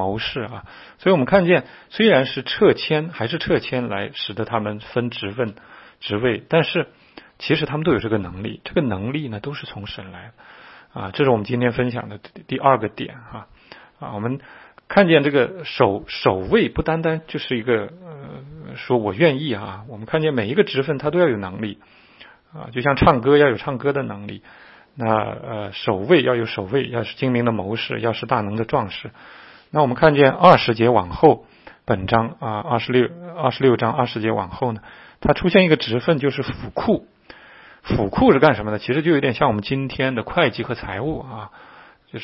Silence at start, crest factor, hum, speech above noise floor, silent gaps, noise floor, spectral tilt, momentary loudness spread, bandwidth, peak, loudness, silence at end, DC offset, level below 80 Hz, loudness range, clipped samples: 0 s; 20 dB; none; 28 dB; none; -48 dBFS; -9.5 dB/octave; 17 LU; 5.8 kHz; 0 dBFS; -20 LUFS; 0 s; under 0.1%; -46 dBFS; 7 LU; under 0.1%